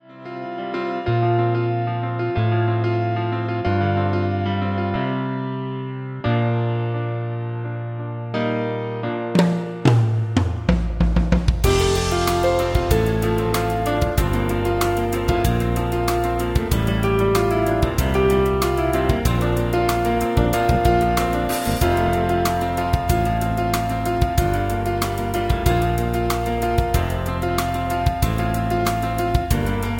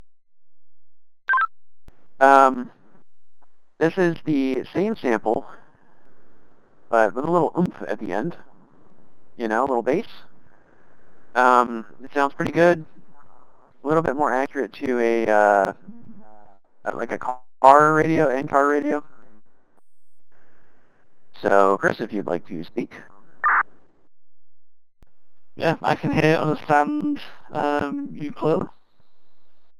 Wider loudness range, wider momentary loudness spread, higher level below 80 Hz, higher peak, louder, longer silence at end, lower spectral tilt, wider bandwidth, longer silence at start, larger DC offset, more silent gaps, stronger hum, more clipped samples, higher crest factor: about the same, 4 LU vs 6 LU; second, 7 LU vs 15 LU; first, -28 dBFS vs -60 dBFS; about the same, -2 dBFS vs 0 dBFS; about the same, -21 LUFS vs -21 LUFS; about the same, 0 s vs 0 s; about the same, -6.5 dB/octave vs -6.5 dB/octave; about the same, 17 kHz vs 15.5 kHz; about the same, 0.1 s vs 0 s; neither; neither; neither; neither; about the same, 18 dB vs 22 dB